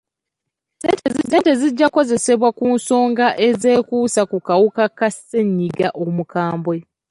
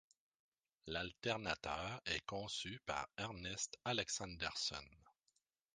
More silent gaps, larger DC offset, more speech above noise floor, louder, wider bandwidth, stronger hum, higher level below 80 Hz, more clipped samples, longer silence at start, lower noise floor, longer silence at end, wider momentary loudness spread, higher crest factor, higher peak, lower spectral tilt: neither; neither; first, 65 dB vs 40 dB; first, -17 LUFS vs -43 LUFS; first, 11.5 kHz vs 10 kHz; neither; first, -60 dBFS vs -66 dBFS; neither; about the same, 0.85 s vs 0.85 s; about the same, -81 dBFS vs -84 dBFS; second, 0.3 s vs 0.65 s; about the same, 7 LU vs 6 LU; second, 14 dB vs 26 dB; first, -4 dBFS vs -22 dBFS; first, -5 dB/octave vs -2.5 dB/octave